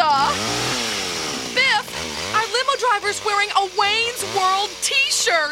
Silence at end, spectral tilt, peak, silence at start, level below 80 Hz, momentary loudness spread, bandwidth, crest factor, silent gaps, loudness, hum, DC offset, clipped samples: 0 s; -1 dB/octave; -4 dBFS; 0 s; -52 dBFS; 5 LU; 16.5 kHz; 16 dB; none; -19 LUFS; none; under 0.1%; under 0.1%